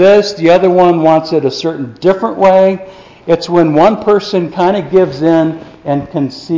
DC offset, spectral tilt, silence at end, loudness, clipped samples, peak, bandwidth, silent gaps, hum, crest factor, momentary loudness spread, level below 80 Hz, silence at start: under 0.1%; -7 dB/octave; 0 s; -11 LUFS; under 0.1%; 0 dBFS; 7.6 kHz; none; none; 10 dB; 10 LU; -48 dBFS; 0 s